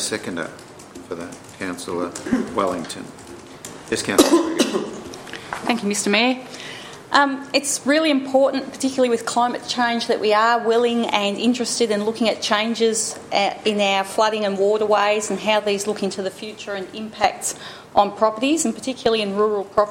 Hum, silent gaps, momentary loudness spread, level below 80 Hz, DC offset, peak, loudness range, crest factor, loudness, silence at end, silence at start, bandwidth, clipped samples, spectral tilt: none; none; 15 LU; -60 dBFS; under 0.1%; 0 dBFS; 3 LU; 20 dB; -20 LUFS; 0 s; 0 s; 16.5 kHz; under 0.1%; -3 dB/octave